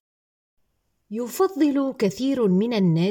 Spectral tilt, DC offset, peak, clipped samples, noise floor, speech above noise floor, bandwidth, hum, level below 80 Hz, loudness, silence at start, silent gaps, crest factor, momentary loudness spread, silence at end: -7 dB/octave; under 0.1%; -10 dBFS; under 0.1%; -71 dBFS; 50 dB; 17.5 kHz; none; -66 dBFS; -22 LUFS; 1.1 s; none; 14 dB; 10 LU; 0 s